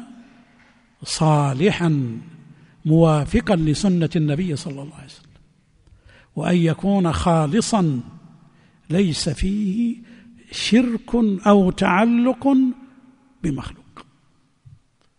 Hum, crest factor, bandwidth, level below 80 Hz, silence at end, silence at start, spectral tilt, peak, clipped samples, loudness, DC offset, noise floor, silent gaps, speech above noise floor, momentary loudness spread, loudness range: none; 18 dB; 10.5 kHz; -40 dBFS; 1.15 s; 0 s; -6.5 dB/octave; -2 dBFS; under 0.1%; -19 LUFS; under 0.1%; -60 dBFS; none; 41 dB; 16 LU; 5 LU